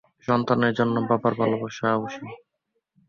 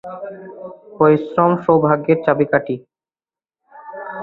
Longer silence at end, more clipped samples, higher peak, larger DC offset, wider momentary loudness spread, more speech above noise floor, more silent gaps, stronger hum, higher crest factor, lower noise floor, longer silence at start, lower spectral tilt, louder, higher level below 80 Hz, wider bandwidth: first, 0.7 s vs 0 s; neither; second, -6 dBFS vs -2 dBFS; neither; second, 12 LU vs 20 LU; second, 54 dB vs over 73 dB; neither; neither; about the same, 20 dB vs 18 dB; second, -77 dBFS vs under -90 dBFS; first, 0.3 s vs 0.05 s; second, -7 dB/octave vs -10.5 dB/octave; second, -24 LUFS vs -16 LUFS; about the same, -62 dBFS vs -60 dBFS; first, 7 kHz vs 4.2 kHz